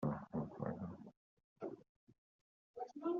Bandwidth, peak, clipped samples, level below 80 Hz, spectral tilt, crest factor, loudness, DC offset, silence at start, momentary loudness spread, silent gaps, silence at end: 7 kHz; -28 dBFS; under 0.1%; -74 dBFS; -9.5 dB/octave; 18 dB; -47 LUFS; under 0.1%; 0 s; 16 LU; 1.17-1.37 s, 1.44-1.56 s, 1.89-2.07 s, 2.18-2.74 s; 0 s